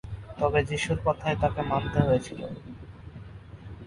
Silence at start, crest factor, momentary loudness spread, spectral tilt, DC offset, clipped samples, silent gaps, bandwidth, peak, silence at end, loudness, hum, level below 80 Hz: 0.05 s; 20 dB; 20 LU; -6.5 dB/octave; under 0.1%; under 0.1%; none; 11.5 kHz; -8 dBFS; 0 s; -27 LUFS; none; -44 dBFS